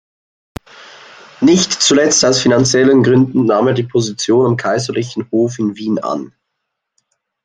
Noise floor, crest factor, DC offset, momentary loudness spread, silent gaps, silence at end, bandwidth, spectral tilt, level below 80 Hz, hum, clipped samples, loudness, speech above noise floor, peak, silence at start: -75 dBFS; 14 dB; under 0.1%; 9 LU; none; 1.15 s; 10 kHz; -4 dB/octave; -52 dBFS; none; under 0.1%; -13 LUFS; 62 dB; 0 dBFS; 0.8 s